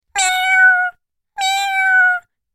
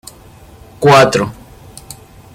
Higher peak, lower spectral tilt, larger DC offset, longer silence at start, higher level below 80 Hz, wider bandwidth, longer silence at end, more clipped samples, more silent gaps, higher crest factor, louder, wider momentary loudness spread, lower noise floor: second, -4 dBFS vs 0 dBFS; second, 4.5 dB/octave vs -5 dB/octave; neither; second, 0.15 s vs 0.8 s; second, -60 dBFS vs -44 dBFS; about the same, 15.5 kHz vs 16.5 kHz; about the same, 0.35 s vs 0.4 s; neither; neither; about the same, 12 dB vs 16 dB; second, -14 LUFS vs -11 LUFS; second, 11 LU vs 26 LU; about the same, -39 dBFS vs -39 dBFS